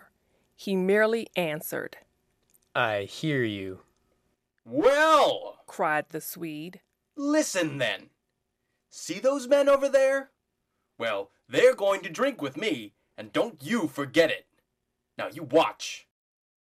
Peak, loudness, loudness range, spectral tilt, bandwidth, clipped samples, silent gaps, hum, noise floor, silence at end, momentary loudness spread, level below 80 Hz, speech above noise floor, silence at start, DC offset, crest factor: -8 dBFS; -26 LUFS; 5 LU; -4 dB/octave; 15 kHz; under 0.1%; none; none; -80 dBFS; 0.7 s; 16 LU; -70 dBFS; 54 dB; 0.6 s; under 0.1%; 20 dB